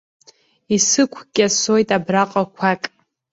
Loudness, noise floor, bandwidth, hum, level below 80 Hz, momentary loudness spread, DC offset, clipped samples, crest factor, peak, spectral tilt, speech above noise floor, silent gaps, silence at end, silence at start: -17 LUFS; -53 dBFS; 8 kHz; none; -60 dBFS; 6 LU; under 0.1%; under 0.1%; 18 dB; -2 dBFS; -3 dB/octave; 35 dB; none; 0.45 s; 0.7 s